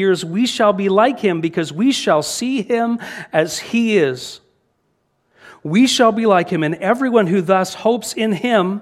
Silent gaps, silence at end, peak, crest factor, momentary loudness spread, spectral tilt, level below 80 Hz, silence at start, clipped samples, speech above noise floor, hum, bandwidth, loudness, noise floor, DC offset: none; 0 s; 0 dBFS; 16 dB; 6 LU; -4.5 dB/octave; -62 dBFS; 0 s; under 0.1%; 50 dB; none; 15 kHz; -17 LUFS; -66 dBFS; under 0.1%